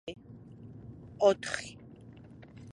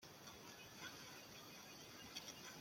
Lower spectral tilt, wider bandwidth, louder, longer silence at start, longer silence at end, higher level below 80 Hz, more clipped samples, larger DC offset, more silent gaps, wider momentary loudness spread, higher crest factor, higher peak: first, -4.5 dB/octave vs -2 dB/octave; second, 11.5 kHz vs 16.5 kHz; first, -30 LUFS vs -55 LUFS; about the same, 0.05 s vs 0 s; about the same, 0 s vs 0 s; first, -62 dBFS vs -82 dBFS; neither; neither; neither; first, 25 LU vs 5 LU; about the same, 24 dB vs 22 dB; first, -12 dBFS vs -36 dBFS